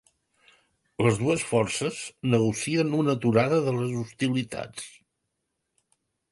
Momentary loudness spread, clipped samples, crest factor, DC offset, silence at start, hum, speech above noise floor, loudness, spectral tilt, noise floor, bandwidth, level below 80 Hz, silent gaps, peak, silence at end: 12 LU; under 0.1%; 20 dB; under 0.1%; 1 s; none; 55 dB; -26 LUFS; -5.5 dB/octave; -80 dBFS; 11.5 kHz; -60 dBFS; none; -8 dBFS; 1.4 s